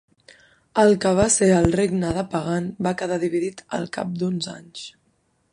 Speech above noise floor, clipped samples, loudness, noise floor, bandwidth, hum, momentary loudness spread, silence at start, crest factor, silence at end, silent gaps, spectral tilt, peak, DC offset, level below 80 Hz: 45 dB; under 0.1%; -21 LUFS; -66 dBFS; 11 kHz; none; 14 LU; 0.75 s; 18 dB; 0.65 s; none; -5 dB/octave; -4 dBFS; under 0.1%; -46 dBFS